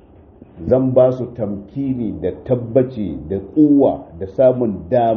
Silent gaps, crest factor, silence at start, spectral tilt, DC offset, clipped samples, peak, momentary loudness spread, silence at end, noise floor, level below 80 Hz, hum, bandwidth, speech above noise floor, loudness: none; 16 dB; 0.55 s; -9.5 dB/octave; under 0.1%; under 0.1%; -2 dBFS; 12 LU; 0 s; -44 dBFS; -44 dBFS; none; 4.2 kHz; 27 dB; -17 LUFS